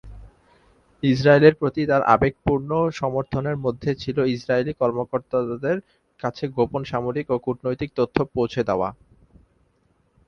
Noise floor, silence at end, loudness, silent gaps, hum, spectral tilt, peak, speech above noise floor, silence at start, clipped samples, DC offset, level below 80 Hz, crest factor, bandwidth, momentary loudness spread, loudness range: -64 dBFS; 1.35 s; -22 LUFS; none; none; -7.5 dB/octave; 0 dBFS; 43 dB; 0.05 s; under 0.1%; under 0.1%; -48 dBFS; 22 dB; 7.2 kHz; 10 LU; 6 LU